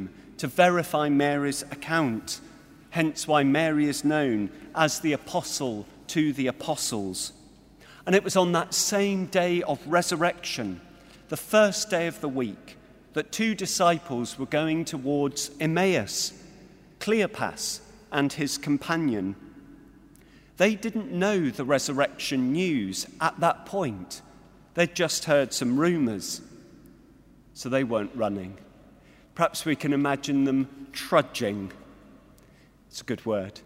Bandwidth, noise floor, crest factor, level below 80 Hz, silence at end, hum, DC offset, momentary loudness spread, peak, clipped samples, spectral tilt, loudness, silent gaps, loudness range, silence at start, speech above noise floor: 16 kHz; -56 dBFS; 22 dB; -60 dBFS; 0.05 s; none; under 0.1%; 12 LU; -6 dBFS; under 0.1%; -4 dB/octave; -26 LUFS; none; 3 LU; 0 s; 30 dB